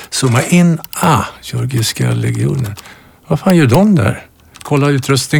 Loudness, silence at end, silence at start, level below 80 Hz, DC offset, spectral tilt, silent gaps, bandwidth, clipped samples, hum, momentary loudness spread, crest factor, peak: -13 LUFS; 0 s; 0 s; -42 dBFS; under 0.1%; -5.5 dB/octave; none; over 20 kHz; under 0.1%; none; 11 LU; 12 dB; 0 dBFS